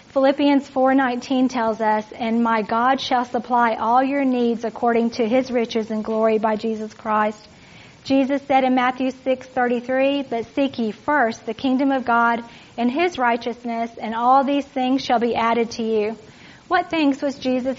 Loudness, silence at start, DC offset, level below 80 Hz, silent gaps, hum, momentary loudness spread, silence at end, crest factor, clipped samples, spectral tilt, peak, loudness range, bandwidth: -20 LUFS; 0.15 s; under 0.1%; -60 dBFS; none; none; 7 LU; 0 s; 16 dB; under 0.1%; -3 dB/octave; -6 dBFS; 2 LU; 7.6 kHz